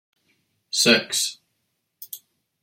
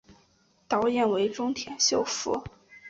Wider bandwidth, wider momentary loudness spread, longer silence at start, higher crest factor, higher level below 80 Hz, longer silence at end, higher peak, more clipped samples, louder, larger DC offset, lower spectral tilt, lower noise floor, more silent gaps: first, 16.5 kHz vs 8 kHz; first, 21 LU vs 8 LU; first, 0.75 s vs 0.1 s; first, 24 dB vs 18 dB; second, -74 dBFS vs -60 dBFS; first, 0.45 s vs 0 s; first, -4 dBFS vs -12 dBFS; neither; first, -20 LUFS vs -27 LUFS; neither; about the same, -1.5 dB/octave vs -2.5 dB/octave; first, -75 dBFS vs -65 dBFS; neither